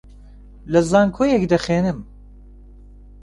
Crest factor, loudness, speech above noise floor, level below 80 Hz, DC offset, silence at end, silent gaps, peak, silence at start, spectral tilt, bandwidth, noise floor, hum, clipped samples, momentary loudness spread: 18 dB; -18 LUFS; 25 dB; -42 dBFS; under 0.1%; 1.2 s; none; -4 dBFS; 0.65 s; -6.5 dB/octave; 11.5 kHz; -42 dBFS; 50 Hz at -40 dBFS; under 0.1%; 7 LU